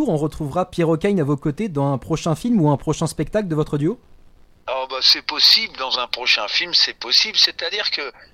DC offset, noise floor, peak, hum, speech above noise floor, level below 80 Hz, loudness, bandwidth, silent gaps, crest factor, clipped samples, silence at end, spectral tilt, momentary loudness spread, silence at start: under 0.1%; -48 dBFS; -2 dBFS; none; 28 dB; -46 dBFS; -18 LUFS; 16 kHz; none; 18 dB; under 0.1%; 0.25 s; -4.5 dB/octave; 10 LU; 0 s